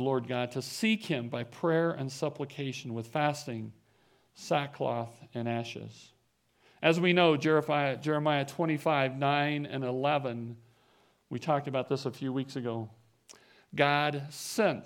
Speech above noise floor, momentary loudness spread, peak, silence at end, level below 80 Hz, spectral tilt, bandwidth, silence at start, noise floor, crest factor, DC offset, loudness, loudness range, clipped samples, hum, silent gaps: 40 dB; 14 LU; -8 dBFS; 0 s; -78 dBFS; -5.5 dB/octave; 17.5 kHz; 0 s; -71 dBFS; 22 dB; under 0.1%; -31 LUFS; 8 LU; under 0.1%; none; none